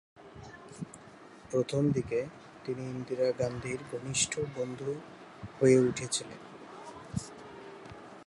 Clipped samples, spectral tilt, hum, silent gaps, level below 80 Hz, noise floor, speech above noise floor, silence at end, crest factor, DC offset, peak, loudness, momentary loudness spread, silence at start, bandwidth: under 0.1%; -4.5 dB/octave; none; none; -62 dBFS; -52 dBFS; 22 dB; 0.05 s; 22 dB; under 0.1%; -12 dBFS; -32 LUFS; 20 LU; 0.2 s; 11.5 kHz